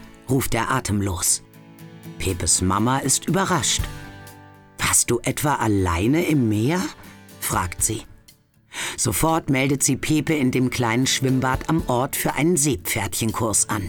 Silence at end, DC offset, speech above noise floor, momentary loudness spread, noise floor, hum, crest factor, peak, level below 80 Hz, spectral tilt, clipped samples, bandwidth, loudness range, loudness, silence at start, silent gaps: 0 s; under 0.1%; 33 dB; 9 LU; -54 dBFS; none; 16 dB; -6 dBFS; -40 dBFS; -4 dB/octave; under 0.1%; over 20 kHz; 3 LU; -21 LUFS; 0 s; none